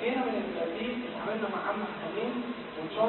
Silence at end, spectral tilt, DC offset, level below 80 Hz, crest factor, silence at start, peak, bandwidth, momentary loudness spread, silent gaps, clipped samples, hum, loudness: 0 s; -3 dB/octave; under 0.1%; -66 dBFS; 16 dB; 0 s; -16 dBFS; 4.2 kHz; 5 LU; none; under 0.1%; none; -34 LUFS